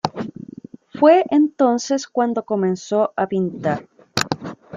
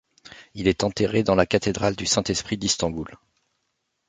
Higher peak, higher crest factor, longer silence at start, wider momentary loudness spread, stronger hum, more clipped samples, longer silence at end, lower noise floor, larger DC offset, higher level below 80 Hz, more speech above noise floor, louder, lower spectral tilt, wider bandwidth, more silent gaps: first, 0 dBFS vs -4 dBFS; about the same, 20 dB vs 22 dB; second, 0.05 s vs 0.25 s; first, 16 LU vs 9 LU; neither; neither; second, 0 s vs 0.95 s; second, -39 dBFS vs -76 dBFS; neither; second, -62 dBFS vs -46 dBFS; second, 21 dB vs 53 dB; first, -19 LUFS vs -23 LUFS; first, -5.5 dB/octave vs -4 dB/octave; first, 15.5 kHz vs 9.6 kHz; neither